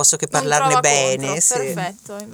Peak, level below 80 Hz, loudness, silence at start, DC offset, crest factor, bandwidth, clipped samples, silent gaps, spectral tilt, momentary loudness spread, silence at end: 0 dBFS; -62 dBFS; -17 LUFS; 0 s; under 0.1%; 18 dB; over 20 kHz; under 0.1%; none; -2 dB/octave; 12 LU; 0 s